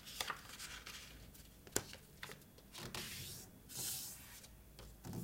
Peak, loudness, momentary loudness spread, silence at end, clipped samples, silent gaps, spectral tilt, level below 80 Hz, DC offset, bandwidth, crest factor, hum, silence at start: -14 dBFS; -47 LUFS; 15 LU; 0 s; under 0.1%; none; -2 dB/octave; -64 dBFS; under 0.1%; 16.5 kHz; 36 dB; none; 0 s